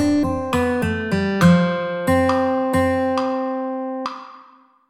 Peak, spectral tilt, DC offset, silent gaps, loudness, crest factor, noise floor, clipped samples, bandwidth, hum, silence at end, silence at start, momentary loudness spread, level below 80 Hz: -4 dBFS; -7 dB/octave; under 0.1%; none; -19 LUFS; 16 dB; -50 dBFS; under 0.1%; 15 kHz; none; 0.5 s; 0 s; 11 LU; -46 dBFS